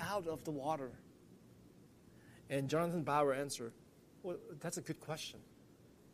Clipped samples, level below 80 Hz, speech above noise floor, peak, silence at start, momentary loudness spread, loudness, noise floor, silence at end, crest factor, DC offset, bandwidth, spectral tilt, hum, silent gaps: under 0.1%; -74 dBFS; 23 dB; -20 dBFS; 0 s; 22 LU; -40 LUFS; -63 dBFS; 0 s; 22 dB; under 0.1%; 15 kHz; -5 dB/octave; none; none